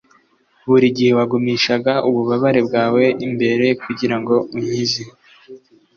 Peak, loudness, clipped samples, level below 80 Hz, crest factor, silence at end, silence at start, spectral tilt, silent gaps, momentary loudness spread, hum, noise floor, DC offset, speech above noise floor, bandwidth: -2 dBFS; -17 LUFS; under 0.1%; -58 dBFS; 14 dB; 0.4 s; 0.65 s; -5.5 dB/octave; none; 6 LU; none; -57 dBFS; under 0.1%; 41 dB; 7 kHz